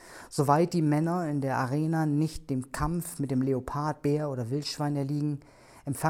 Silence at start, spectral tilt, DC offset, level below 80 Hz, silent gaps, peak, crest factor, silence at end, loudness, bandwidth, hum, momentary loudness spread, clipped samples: 0 s; -6.5 dB/octave; under 0.1%; -50 dBFS; none; -10 dBFS; 20 dB; 0 s; -29 LUFS; 16.5 kHz; none; 8 LU; under 0.1%